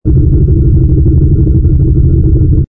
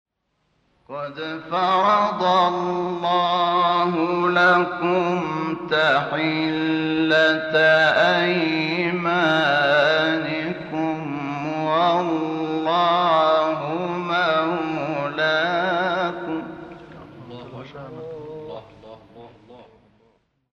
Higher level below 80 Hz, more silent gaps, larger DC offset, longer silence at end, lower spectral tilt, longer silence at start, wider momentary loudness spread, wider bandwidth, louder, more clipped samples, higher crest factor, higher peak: first, -10 dBFS vs -62 dBFS; neither; neither; second, 0.05 s vs 0.9 s; first, -15.5 dB/octave vs -6 dB/octave; second, 0.05 s vs 0.9 s; second, 1 LU vs 18 LU; second, 1.5 kHz vs 8 kHz; first, -9 LUFS vs -20 LUFS; neither; second, 6 dB vs 14 dB; first, 0 dBFS vs -6 dBFS